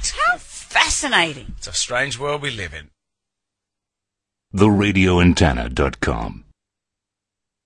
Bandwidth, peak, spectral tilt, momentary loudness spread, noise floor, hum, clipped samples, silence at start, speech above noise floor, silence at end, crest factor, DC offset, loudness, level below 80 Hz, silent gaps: 11.5 kHz; -2 dBFS; -4 dB/octave; 15 LU; -84 dBFS; none; under 0.1%; 0 s; 65 dB; 1.3 s; 20 dB; under 0.1%; -18 LUFS; -36 dBFS; none